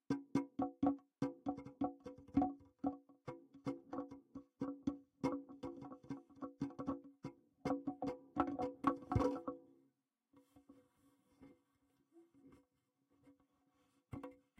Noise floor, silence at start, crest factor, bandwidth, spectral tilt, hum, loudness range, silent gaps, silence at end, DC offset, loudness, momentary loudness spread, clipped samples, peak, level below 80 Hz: -83 dBFS; 0.1 s; 24 dB; 9 kHz; -8 dB/octave; none; 5 LU; none; 0.25 s; under 0.1%; -44 LUFS; 16 LU; under 0.1%; -20 dBFS; -66 dBFS